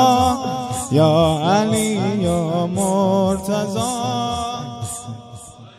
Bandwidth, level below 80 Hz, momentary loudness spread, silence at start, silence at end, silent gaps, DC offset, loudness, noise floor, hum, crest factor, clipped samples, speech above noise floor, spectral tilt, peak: 15 kHz; -44 dBFS; 13 LU; 0 s; 0.1 s; none; under 0.1%; -19 LUFS; -38 dBFS; none; 16 dB; under 0.1%; 21 dB; -5.5 dB/octave; -2 dBFS